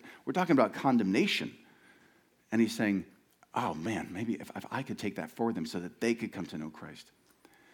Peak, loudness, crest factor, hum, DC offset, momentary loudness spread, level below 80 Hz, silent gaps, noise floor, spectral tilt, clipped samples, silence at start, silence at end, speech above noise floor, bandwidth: -12 dBFS; -32 LUFS; 22 dB; none; under 0.1%; 14 LU; -72 dBFS; none; -66 dBFS; -5.5 dB/octave; under 0.1%; 0.05 s; 0.7 s; 34 dB; 18 kHz